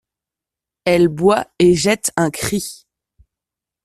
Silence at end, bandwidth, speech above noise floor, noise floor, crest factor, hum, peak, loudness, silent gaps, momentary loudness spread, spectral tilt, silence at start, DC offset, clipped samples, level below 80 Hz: 1.1 s; 14 kHz; 71 dB; -87 dBFS; 18 dB; none; -2 dBFS; -16 LUFS; none; 10 LU; -4.5 dB/octave; 0.85 s; under 0.1%; under 0.1%; -48 dBFS